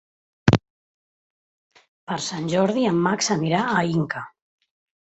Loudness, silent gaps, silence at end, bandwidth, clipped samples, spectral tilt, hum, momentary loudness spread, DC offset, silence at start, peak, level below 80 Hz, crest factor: -22 LUFS; 0.70-1.70 s, 1.88-2.07 s; 0.8 s; 8.2 kHz; under 0.1%; -5 dB/octave; none; 9 LU; under 0.1%; 0.45 s; -2 dBFS; -50 dBFS; 24 dB